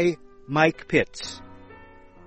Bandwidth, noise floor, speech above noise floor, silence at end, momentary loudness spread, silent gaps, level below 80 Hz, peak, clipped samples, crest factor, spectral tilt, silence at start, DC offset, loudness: 8.4 kHz; -48 dBFS; 24 dB; 0.55 s; 16 LU; none; -52 dBFS; -4 dBFS; under 0.1%; 22 dB; -5.5 dB/octave; 0 s; under 0.1%; -24 LUFS